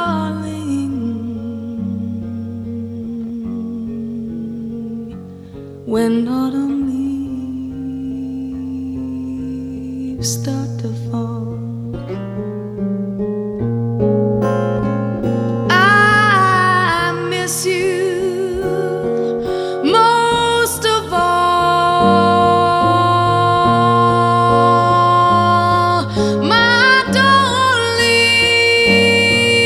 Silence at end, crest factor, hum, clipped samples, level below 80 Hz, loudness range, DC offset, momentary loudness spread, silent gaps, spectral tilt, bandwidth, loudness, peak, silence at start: 0 s; 14 dB; none; under 0.1%; -44 dBFS; 12 LU; under 0.1%; 15 LU; none; -4.5 dB/octave; 15 kHz; -15 LUFS; -2 dBFS; 0 s